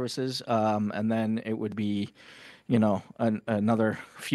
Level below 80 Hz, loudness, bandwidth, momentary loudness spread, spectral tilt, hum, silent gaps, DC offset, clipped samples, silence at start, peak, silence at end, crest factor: -70 dBFS; -28 LUFS; 12.5 kHz; 12 LU; -6.5 dB/octave; none; none; under 0.1%; under 0.1%; 0 s; -10 dBFS; 0 s; 18 dB